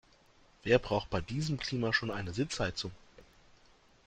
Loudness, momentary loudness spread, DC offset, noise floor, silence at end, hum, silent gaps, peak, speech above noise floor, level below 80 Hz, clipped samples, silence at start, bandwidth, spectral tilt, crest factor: -33 LUFS; 10 LU; under 0.1%; -64 dBFS; 0.85 s; none; none; -12 dBFS; 31 dB; -54 dBFS; under 0.1%; 0.65 s; 9.4 kHz; -5 dB/octave; 24 dB